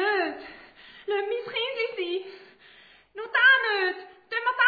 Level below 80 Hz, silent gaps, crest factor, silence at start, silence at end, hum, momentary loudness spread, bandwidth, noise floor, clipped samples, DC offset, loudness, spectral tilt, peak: -72 dBFS; none; 18 dB; 0 s; 0 s; none; 23 LU; 4.9 kHz; -54 dBFS; under 0.1%; under 0.1%; -25 LUFS; -4 dB/octave; -8 dBFS